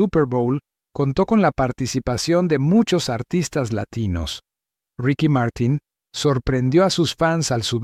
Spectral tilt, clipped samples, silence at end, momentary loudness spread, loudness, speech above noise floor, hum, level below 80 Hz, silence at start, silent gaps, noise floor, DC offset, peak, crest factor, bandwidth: -6 dB/octave; under 0.1%; 0 s; 8 LU; -20 LUFS; 67 dB; none; -42 dBFS; 0 s; none; -86 dBFS; under 0.1%; -4 dBFS; 16 dB; 15 kHz